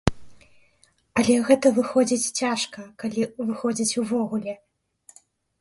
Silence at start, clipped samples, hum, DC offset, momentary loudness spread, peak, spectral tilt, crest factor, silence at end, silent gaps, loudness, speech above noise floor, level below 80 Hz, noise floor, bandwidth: 0.05 s; under 0.1%; none; under 0.1%; 12 LU; 0 dBFS; -4 dB/octave; 24 dB; 1.05 s; none; -23 LUFS; 40 dB; -48 dBFS; -63 dBFS; 11.5 kHz